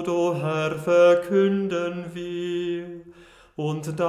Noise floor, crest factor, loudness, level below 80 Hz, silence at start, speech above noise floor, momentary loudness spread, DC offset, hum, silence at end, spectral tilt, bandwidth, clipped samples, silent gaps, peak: -50 dBFS; 16 dB; -23 LUFS; -62 dBFS; 0 s; 27 dB; 15 LU; under 0.1%; none; 0 s; -6.5 dB/octave; 13 kHz; under 0.1%; none; -8 dBFS